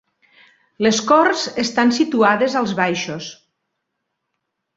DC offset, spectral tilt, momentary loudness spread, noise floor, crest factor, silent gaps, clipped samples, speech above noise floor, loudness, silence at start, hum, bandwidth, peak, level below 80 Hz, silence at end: under 0.1%; -4 dB/octave; 11 LU; -76 dBFS; 18 dB; none; under 0.1%; 59 dB; -17 LUFS; 0.8 s; none; 8 kHz; 0 dBFS; -62 dBFS; 1.45 s